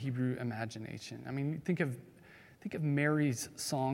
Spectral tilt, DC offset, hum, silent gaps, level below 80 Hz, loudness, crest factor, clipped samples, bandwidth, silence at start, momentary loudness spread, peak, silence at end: -5.5 dB/octave; under 0.1%; none; none; -74 dBFS; -36 LUFS; 18 dB; under 0.1%; 16.5 kHz; 0 s; 14 LU; -18 dBFS; 0 s